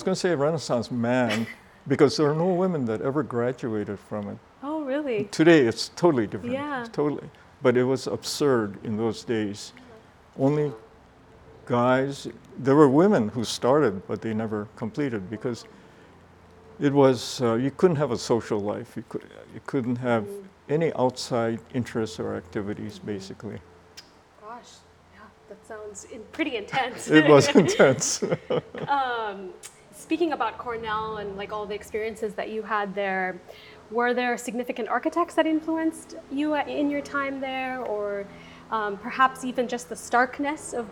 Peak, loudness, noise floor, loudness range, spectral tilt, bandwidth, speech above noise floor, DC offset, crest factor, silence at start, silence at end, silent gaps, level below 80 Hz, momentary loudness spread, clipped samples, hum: -2 dBFS; -25 LUFS; -52 dBFS; 9 LU; -5.5 dB/octave; 19 kHz; 28 dB; under 0.1%; 24 dB; 0 s; 0 s; none; -64 dBFS; 18 LU; under 0.1%; none